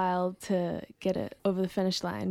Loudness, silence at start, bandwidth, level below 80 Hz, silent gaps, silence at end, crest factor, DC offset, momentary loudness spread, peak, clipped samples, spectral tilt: -31 LUFS; 0 s; 14.5 kHz; -62 dBFS; none; 0 s; 14 dB; under 0.1%; 4 LU; -16 dBFS; under 0.1%; -6 dB/octave